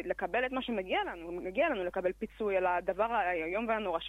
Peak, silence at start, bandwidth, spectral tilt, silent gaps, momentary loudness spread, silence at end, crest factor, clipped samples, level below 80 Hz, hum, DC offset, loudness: -18 dBFS; 0 s; 13.5 kHz; -6 dB/octave; none; 6 LU; 0 s; 14 dB; under 0.1%; -58 dBFS; none; under 0.1%; -33 LUFS